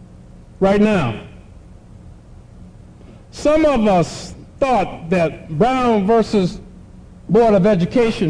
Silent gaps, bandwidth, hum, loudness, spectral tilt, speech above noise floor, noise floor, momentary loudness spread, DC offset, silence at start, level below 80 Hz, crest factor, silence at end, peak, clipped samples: none; 10.5 kHz; none; -16 LUFS; -7 dB/octave; 25 dB; -41 dBFS; 15 LU; under 0.1%; 0 s; -38 dBFS; 12 dB; 0 s; -6 dBFS; under 0.1%